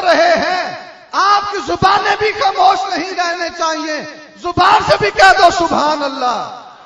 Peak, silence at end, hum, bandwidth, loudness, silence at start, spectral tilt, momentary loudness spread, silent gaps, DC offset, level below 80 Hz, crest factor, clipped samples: 0 dBFS; 0.15 s; none; 12 kHz; -13 LUFS; 0 s; -3 dB/octave; 13 LU; none; under 0.1%; -44 dBFS; 14 dB; 0.3%